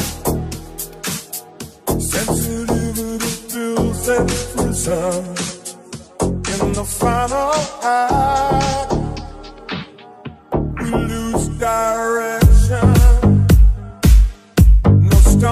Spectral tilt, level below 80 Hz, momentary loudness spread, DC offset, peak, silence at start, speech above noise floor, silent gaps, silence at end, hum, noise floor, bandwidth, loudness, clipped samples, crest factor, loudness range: -5.5 dB/octave; -18 dBFS; 16 LU; under 0.1%; 0 dBFS; 0 s; 18 dB; none; 0 s; none; -36 dBFS; 15.5 kHz; -17 LUFS; under 0.1%; 14 dB; 8 LU